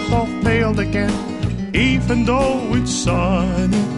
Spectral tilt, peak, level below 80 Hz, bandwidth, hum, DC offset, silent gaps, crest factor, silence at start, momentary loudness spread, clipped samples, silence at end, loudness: -5.5 dB/octave; -4 dBFS; -28 dBFS; 11.5 kHz; none; 0.3%; none; 14 dB; 0 s; 5 LU; under 0.1%; 0 s; -18 LUFS